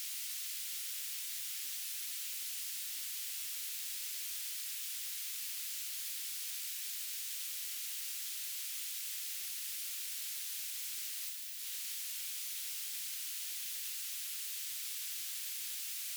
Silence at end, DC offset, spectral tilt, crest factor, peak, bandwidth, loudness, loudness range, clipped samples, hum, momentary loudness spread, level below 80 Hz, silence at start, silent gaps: 0 s; under 0.1%; 10 dB/octave; 18 dB; -24 dBFS; over 20 kHz; -38 LUFS; 0 LU; under 0.1%; none; 0 LU; under -90 dBFS; 0 s; none